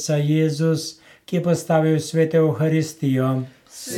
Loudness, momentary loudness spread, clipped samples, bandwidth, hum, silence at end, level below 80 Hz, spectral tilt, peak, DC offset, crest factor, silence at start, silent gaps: -20 LUFS; 9 LU; under 0.1%; 15.5 kHz; none; 0 s; -68 dBFS; -6.5 dB/octave; -4 dBFS; under 0.1%; 16 dB; 0 s; none